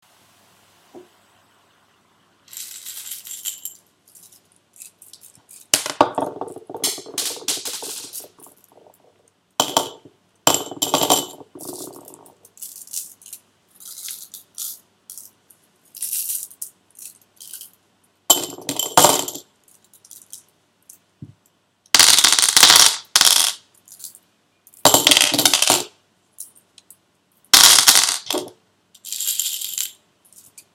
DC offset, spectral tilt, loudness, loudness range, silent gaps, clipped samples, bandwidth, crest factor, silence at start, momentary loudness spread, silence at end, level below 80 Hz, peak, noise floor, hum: under 0.1%; 0.5 dB/octave; -15 LUFS; 21 LU; none; under 0.1%; over 20 kHz; 22 dB; 0.95 s; 27 LU; 0.85 s; -62 dBFS; 0 dBFS; -63 dBFS; none